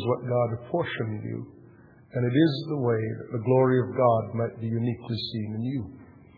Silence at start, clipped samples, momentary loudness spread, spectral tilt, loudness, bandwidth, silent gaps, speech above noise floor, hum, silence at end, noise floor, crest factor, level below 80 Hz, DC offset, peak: 0 s; under 0.1%; 12 LU; -10 dB/octave; -27 LUFS; 4.9 kHz; none; 27 dB; none; 0.25 s; -53 dBFS; 18 dB; -62 dBFS; under 0.1%; -10 dBFS